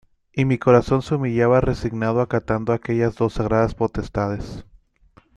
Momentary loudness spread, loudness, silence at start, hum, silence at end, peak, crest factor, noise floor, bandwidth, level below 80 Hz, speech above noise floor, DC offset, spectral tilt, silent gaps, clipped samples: 9 LU; -21 LUFS; 0.35 s; none; 0.75 s; -2 dBFS; 18 dB; -55 dBFS; 9.8 kHz; -40 dBFS; 35 dB; under 0.1%; -8 dB/octave; none; under 0.1%